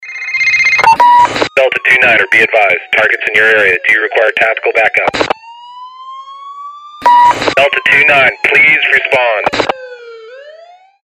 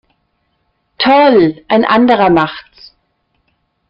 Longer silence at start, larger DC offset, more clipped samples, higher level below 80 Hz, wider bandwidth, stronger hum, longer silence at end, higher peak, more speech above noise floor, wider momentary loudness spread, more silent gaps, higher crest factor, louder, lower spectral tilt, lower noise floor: second, 0 s vs 1 s; neither; neither; about the same, -48 dBFS vs -50 dBFS; first, 16 kHz vs 5.8 kHz; neither; second, 0.55 s vs 1.3 s; about the same, 0 dBFS vs 0 dBFS; second, 29 dB vs 54 dB; first, 20 LU vs 9 LU; neither; about the same, 10 dB vs 14 dB; about the same, -8 LUFS vs -10 LUFS; second, -2.5 dB/octave vs -7.5 dB/octave; second, -38 dBFS vs -63 dBFS